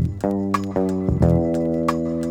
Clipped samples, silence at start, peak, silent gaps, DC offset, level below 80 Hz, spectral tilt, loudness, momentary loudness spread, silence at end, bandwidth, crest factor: under 0.1%; 0 s; -2 dBFS; none; under 0.1%; -38 dBFS; -8.5 dB/octave; -21 LUFS; 5 LU; 0 s; 16 kHz; 18 dB